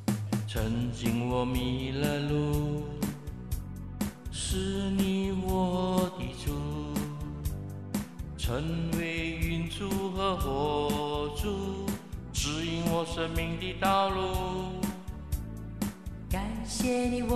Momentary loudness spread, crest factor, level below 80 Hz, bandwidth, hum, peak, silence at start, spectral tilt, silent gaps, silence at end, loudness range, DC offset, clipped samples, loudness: 9 LU; 18 dB; -40 dBFS; 14 kHz; none; -12 dBFS; 0 s; -5.5 dB/octave; none; 0 s; 3 LU; 0.2%; under 0.1%; -32 LUFS